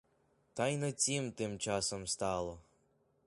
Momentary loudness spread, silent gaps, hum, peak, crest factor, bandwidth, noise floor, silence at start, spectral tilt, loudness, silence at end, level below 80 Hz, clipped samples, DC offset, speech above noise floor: 10 LU; none; none; -20 dBFS; 18 dB; 11.5 kHz; -74 dBFS; 0.55 s; -3.5 dB/octave; -36 LUFS; 0.65 s; -64 dBFS; under 0.1%; under 0.1%; 38 dB